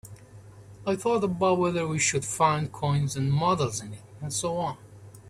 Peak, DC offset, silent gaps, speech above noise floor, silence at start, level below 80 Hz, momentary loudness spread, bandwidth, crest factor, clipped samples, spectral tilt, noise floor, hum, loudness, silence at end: -10 dBFS; under 0.1%; none; 22 dB; 0.05 s; -56 dBFS; 11 LU; 13.5 kHz; 18 dB; under 0.1%; -5 dB/octave; -48 dBFS; none; -26 LUFS; 0 s